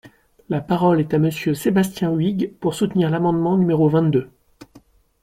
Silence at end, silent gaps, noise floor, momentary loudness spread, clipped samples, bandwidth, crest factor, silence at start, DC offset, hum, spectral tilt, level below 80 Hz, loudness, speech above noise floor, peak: 0.45 s; none; -52 dBFS; 6 LU; under 0.1%; 16 kHz; 14 dB; 0.05 s; under 0.1%; none; -7.5 dB/octave; -54 dBFS; -19 LUFS; 33 dB; -6 dBFS